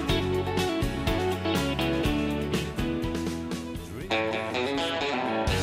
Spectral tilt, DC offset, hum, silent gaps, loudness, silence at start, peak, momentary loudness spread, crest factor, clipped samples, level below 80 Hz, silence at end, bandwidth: -5.5 dB/octave; under 0.1%; none; none; -28 LUFS; 0 s; -14 dBFS; 5 LU; 14 dB; under 0.1%; -40 dBFS; 0 s; 16 kHz